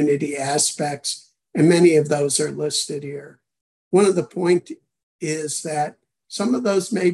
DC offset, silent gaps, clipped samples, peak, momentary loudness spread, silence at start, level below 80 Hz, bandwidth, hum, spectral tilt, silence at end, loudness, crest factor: under 0.1%; 3.61-3.91 s, 5.03-5.19 s; under 0.1%; -4 dBFS; 15 LU; 0 s; -68 dBFS; 12.5 kHz; none; -4.5 dB/octave; 0 s; -20 LUFS; 16 dB